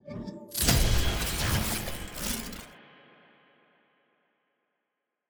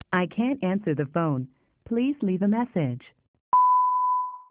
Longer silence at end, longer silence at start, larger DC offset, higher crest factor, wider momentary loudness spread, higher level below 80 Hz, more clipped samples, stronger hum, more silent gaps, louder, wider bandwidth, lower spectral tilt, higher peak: first, 2.5 s vs 0.1 s; about the same, 0.05 s vs 0.1 s; neither; first, 22 dB vs 16 dB; first, 16 LU vs 11 LU; first, -36 dBFS vs -64 dBFS; neither; neither; second, none vs 3.28-3.34 s, 3.40-3.52 s; second, -29 LUFS vs -25 LUFS; first, over 20 kHz vs 4 kHz; second, -3.5 dB/octave vs -6.5 dB/octave; about the same, -10 dBFS vs -10 dBFS